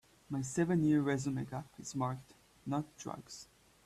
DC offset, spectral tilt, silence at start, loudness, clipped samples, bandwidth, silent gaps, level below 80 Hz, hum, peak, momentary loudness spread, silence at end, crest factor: under 0.1%; -6.5 dB/octave; 0.3 s; -36 LUFS; under 0.1%; 13.5 kHz; none; -68 dBFS; none; -20 dBFS; 17 LU; 0.4 s; 16 dB